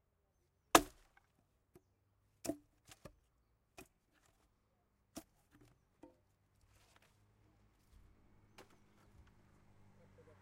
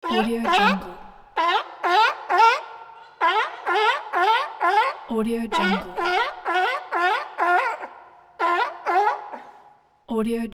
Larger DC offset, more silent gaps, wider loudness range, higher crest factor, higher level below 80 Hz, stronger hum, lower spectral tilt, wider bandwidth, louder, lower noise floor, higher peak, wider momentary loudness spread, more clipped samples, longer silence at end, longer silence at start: neither; neither; first, 28 LU vs 3 LU; first, 38 dB vs 18 dB; second, -68 dBFS vs -54 dBFS; neither; second, -2 dB/octave vs -4.5 dB/octave; about the same, 16 kHz vs 17 kHz; second, -35 LUFS vs -22 LUFS; first, -80 dBFS vs -54 dBFS; about the same, -8 dBFS vs -6 dBFS; first, 30 LU vs 11 LU; neither; first, 5.2 s vs 0.05 s; first, 0.75 s vs 0.05 s